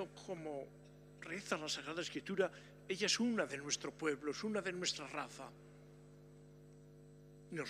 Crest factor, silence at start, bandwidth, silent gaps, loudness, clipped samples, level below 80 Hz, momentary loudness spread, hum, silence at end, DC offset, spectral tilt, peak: 22 dB; 0 s; 15.5 kHz; none; -41 LUFS; under 0.1%; -74 dBFS; 24 LU; 50 Hz at -65 dBFS; 0 s; under 0.1%; -3 dB/octave; -22 dBFS